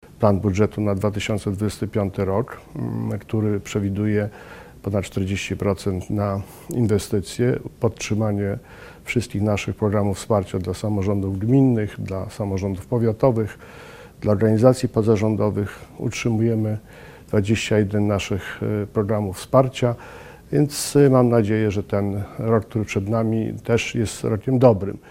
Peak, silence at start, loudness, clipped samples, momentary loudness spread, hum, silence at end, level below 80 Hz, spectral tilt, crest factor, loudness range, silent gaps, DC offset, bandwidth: 0 dBFS; 0.05 s; -22 LUFS; under 0.1%; 11 LU; none; 0.1 s; -46 dBFS; -7 dB/octave; 22 dB; 5 LU; none; under 0.1%; 16 kHz